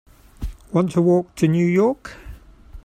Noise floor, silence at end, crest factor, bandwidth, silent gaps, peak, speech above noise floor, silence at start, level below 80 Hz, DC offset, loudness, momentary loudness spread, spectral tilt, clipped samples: -42 dBFS; 0.05 s; 16 dB; 13 kHz; none; -4 dBFS; 24 dB; 0.4 s; -40 dBFS; under 0.1%; -19 LUFS; 18 LU; -8 dB/octave; under 0.1%